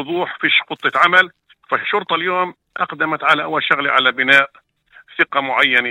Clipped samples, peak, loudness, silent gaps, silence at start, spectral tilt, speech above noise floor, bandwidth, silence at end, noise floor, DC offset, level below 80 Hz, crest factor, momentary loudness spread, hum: under 0.1%; 0 dBFS; -16 LUFS; none; 0 s; -4 dB/octave; 32 dB; 16.5 kHz; 0 s; -49 dBFS; under 0.1%; -66 dBFS; 18 dB; 10 LU; none